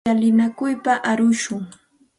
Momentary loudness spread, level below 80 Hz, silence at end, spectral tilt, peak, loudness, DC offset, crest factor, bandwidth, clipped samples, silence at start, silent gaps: 12 LU; -60 dBFS; 0.5 s; -5 dB/octave; -6 dBFS; -19 LUFS; under 0.1%; 14 dB; 11.5 kHz; under 0.1%; 0.05 s; none